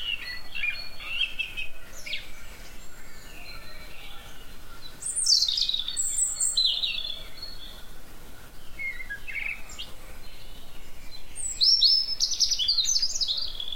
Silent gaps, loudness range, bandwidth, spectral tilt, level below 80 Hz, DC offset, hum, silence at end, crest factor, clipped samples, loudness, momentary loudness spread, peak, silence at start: none; 14 LU; 16.5 kHz; 1.5 dB/octave; -44 dBFS; 0.5%; none; 0 s; 20 dB; under 0.1%; -24 LUFS; 25 LU; -10 dBFS; 0 s